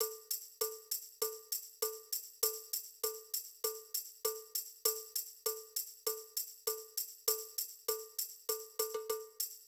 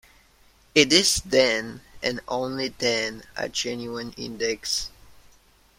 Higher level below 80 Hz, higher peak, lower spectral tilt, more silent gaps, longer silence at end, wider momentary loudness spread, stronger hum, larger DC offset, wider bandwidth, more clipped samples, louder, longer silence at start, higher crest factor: second, -86 dBFS vs -52 dBFS; second, -18 dBFS vs -2 dBFS; second, 2.5 dB/octave vs -2 dB/octave; neither; second, 0 s vs 0.65 s; second, 6 LU vs 16 LU; neither; neither; first, over 20 kHz vs 16.5 kHz; neither; second, -39 LUFS vs -23 LUFS; second, 0 s vs 0.75 s; about the same, 24 dB vs 24 dB